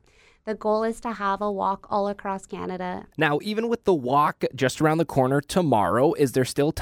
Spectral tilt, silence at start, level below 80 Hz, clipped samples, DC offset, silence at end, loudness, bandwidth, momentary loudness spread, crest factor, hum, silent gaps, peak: -6 dB/octave; 0.45 s; -54 dBFS; under 0.1%; under 0.1%; 0 s; -24 LUFS; 17.5 kHz; 10 LU; 18 dB; none; none; -6 dBFS